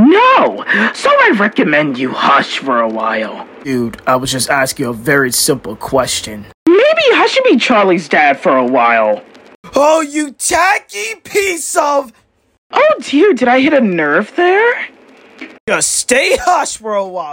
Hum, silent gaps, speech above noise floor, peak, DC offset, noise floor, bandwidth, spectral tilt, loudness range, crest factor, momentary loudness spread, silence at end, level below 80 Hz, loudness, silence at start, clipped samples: none; 6.54-6.66 s, 9.55-9.63 s, 12.58-12.70 s, 15.60-15.67 s; 23 dB; 0 dBFS; under 0.1%; -35 dBFS; 16.5 kHz; -3 dB/octave; 4 LU; 12 dB; 9 LU; 0 s; -48 dBFS; -12 LUFS; 0 s; under 0.1%